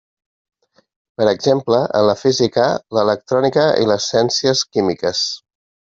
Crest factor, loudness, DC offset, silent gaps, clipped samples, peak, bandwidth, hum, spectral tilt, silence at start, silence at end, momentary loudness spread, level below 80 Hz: 16 dB; -16 LUFS; under 0.1%; none; under 0.1%; -2 dBFS; 7.8 kHz; none; -4 dB/octave; 1.2 s; 0.5 s; 4 LU; -58 dBFS